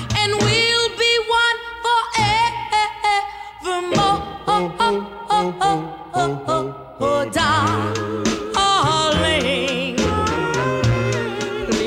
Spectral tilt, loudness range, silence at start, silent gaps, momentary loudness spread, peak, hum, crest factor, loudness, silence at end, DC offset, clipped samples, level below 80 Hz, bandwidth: -4 dB/octave; 3 LU; 0 s; none; 7 LU; -6 dBFS; none; 14 dB; -19 LUFS; 0 s; under 0.1%; under 0.1%; -40 dBFS; 16 kHz